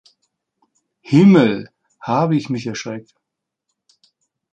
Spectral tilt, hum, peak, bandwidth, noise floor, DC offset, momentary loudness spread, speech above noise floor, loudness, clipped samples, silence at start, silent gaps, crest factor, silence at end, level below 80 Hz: -7.5 dB/octave; none; -2 dBFS; 8 kHz; -81 dBFS; under 0.1%; 19 LU; 66 dB; -16 LUFS; under 0.1%; 1.1 s; none; 18 dB; 1.55 s; -60 dBFS